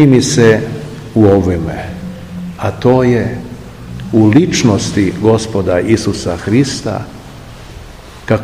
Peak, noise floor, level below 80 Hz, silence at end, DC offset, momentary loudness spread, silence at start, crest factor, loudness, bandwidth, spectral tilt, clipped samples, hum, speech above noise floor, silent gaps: 0 dBFS; -32 dBFS; -36 dBFS; 0 s; 0.3%; 21 LU; 0 s; 12 dB; -12 LUFS; 15 kHz; -6 dB/octave; 0.8%; none; 22 dB; none